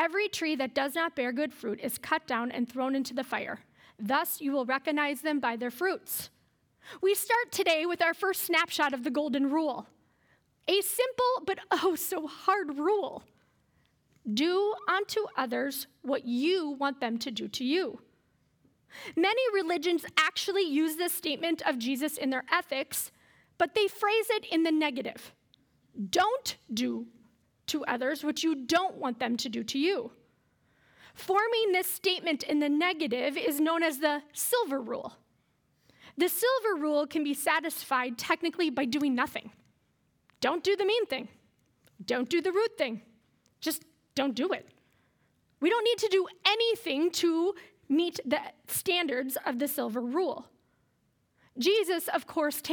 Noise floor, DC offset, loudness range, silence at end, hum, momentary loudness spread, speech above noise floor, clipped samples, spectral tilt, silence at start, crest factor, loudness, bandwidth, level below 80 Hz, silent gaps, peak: -73 dBFS; under 0.1%; 4 LU; 0 s; none; 8 LU; 43 dB; under 0.1%; -2.5 dB/octave; 0 s; 24 dB; -30 LUFS; over 20 kHz; -78 dBFS; none; -6 dBFS